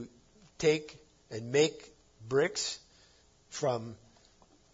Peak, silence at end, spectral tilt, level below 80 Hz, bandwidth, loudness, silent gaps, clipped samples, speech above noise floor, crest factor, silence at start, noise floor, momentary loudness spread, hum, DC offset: -14 dBFS; 0.8 s; -4 dB/octave; -68 dBFS; 7.8 kHz; -32 LUFS; none; under 0.1%; 32 dB; 20 dB; 0 s; -63 dBFS; 19 LU; none; under 0.1%